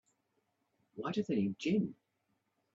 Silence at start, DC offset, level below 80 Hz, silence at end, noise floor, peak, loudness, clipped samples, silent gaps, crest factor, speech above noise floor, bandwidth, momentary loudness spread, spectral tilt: 0.95 s; under 0.1%; -78 dBFS; 0.8 s; -81 dBFS; -22 dBFS; -36 LUFS; under 0.1%; none; 18 dB; 47 dB; 7.8 kHz; 10 LU; -7 dB/octave